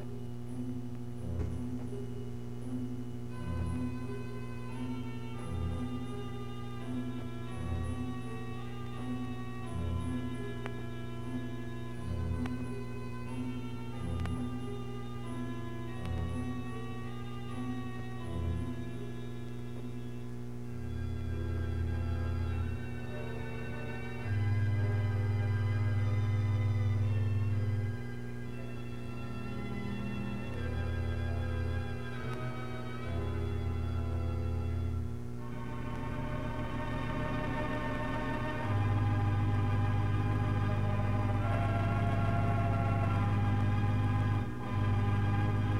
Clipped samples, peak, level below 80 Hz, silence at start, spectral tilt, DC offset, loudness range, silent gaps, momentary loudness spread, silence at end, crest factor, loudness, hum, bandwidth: under 0.1%; -18 dBFS; -48 dBFS; 0 s; -8 dB/octave; 0.8%; 8 LU; none; 11 LU; 0 s; 16 dB; -36 LUFS; 60 Hz at -40 dBFS; 11.5 kHz